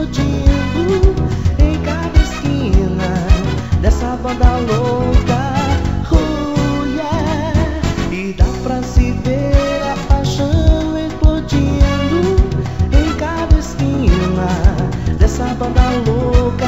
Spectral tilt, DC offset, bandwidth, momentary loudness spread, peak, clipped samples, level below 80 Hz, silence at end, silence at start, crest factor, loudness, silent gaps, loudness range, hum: -7 dB/octave; 2%; 8 kHz; 4 LU; 0 dBFS; under 0.1%; -16 dBFS; 0 s; 0 s; 14 dB; -15 LUFS; none; 2 LU; none